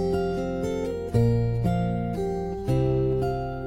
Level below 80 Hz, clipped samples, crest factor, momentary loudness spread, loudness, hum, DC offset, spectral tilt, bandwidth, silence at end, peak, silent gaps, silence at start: -38 dBFS; under 0.1%; 16 dB; 5 LU; -26 LUFS; none; under 0.1%; -8.5 dB/octave; 12 kHz; 0 s; -8 dBFS; none; 0 s